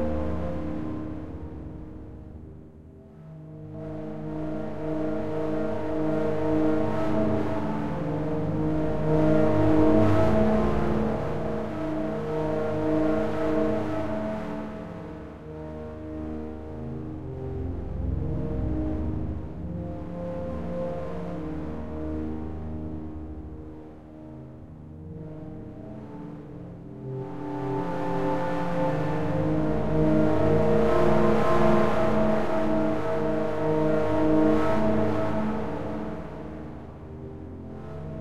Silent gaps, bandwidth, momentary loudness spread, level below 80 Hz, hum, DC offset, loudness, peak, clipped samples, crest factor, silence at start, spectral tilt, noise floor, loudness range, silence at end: none; 10 kHz; 18 LU; -42 dBFS; none; 1%; -27 LUFS; -8 dBFS; under 0.1%; 18 dB; 0 s; -8.5 dB/octave; -47 dBFS; 15 LU; 0 s